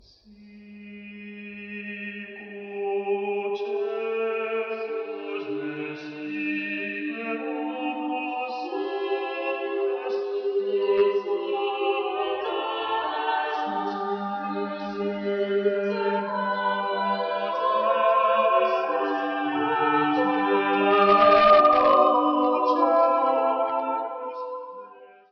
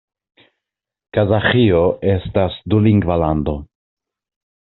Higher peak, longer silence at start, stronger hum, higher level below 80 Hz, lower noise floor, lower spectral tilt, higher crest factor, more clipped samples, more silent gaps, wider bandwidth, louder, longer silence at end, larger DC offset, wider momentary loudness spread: second, -6 dBFS vs -2 dBFS; second, 0.3 s vs 1.15 s; neither; second, -66 dBFS vs -38 dBFS; second, -51 dBFS vs -82 dBFS; about the same, -6.5 dB/octave vs -6 dB/octave; about the same, 20 dB vs 16 dB; neither; neither; first, 6.2 kHz vs 4.2 kHz; second, -24 LUFS vs -16 LUFS; second, 0.25 s vs 1.05 s; neither; first, 14 LU vs 8 LU